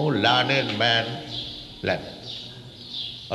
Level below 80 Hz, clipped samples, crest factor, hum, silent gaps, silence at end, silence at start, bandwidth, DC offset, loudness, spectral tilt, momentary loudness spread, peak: -56 dBFS; under 0.1%; 20 dB; none; none; 0 s; 0 s; 12 kHz; under 0.1%; -24 LUFS; -5 dB/octave; 15 LU; -6 dBFS